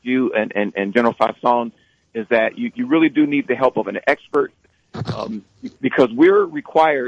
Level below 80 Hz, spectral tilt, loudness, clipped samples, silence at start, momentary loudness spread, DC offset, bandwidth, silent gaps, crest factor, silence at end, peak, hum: -60 dBFS; -7 dB/octave; -18 LUFS; under 0.1%; 0.05 s; 16 LU; under 0.1%; 8 kHz; none; 16 dB; 0 s; -2 dBFS; none